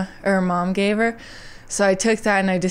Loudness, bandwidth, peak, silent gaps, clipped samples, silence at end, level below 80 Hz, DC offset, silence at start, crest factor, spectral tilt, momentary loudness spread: -20 LUFS; 13.5 kHz; -6 dBFS; none; under 0.1%; 0 s; -46 dBFS; 0.1%; 0 s; 14 dB; -5 dB/octave; 16 LU